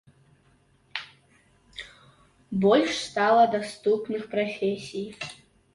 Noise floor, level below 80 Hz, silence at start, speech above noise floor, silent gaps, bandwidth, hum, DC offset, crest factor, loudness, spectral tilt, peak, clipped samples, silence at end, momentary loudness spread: -63 dBFS; -66 dBFS; 0.95 s; 38 dB; none; 11.5 kHz; none; under 0.1%; 18 dB; -25 LUFS; -5 dB/octave; -8 dBFS; under 0.1%; 0.4 s; 21 LU